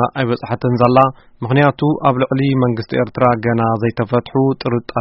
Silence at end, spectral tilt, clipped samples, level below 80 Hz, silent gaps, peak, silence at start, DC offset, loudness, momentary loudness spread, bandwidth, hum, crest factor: 0 s; -6.5 dB/octave; under 0.1%; -48 dBFS; none; 0 dBFS; 0 s; under 0.1%; -16 LUFS; 6 LU; 5.8 kHz; none; 16 dB